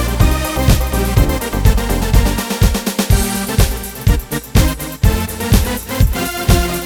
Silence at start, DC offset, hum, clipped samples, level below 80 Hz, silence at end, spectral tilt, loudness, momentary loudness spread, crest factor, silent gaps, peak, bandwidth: 0 s; under 0.1%; none; under 0.1%; -18 dBFS; 0 s; -5 dB/octave; -16 LUFS; 3 LU; 14 dB; none; 0 dBFS; over 20 kHz